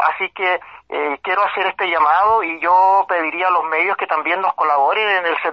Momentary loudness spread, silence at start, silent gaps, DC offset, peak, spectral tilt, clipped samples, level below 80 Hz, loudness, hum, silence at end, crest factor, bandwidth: 6 LU; 0 s; none; under 0.1%; -2 dBFS; -4.5 dB/octave; under 0.1%; -60 dBFS; -16 LUFS; none; 0 s; 14 dB; 6 kHz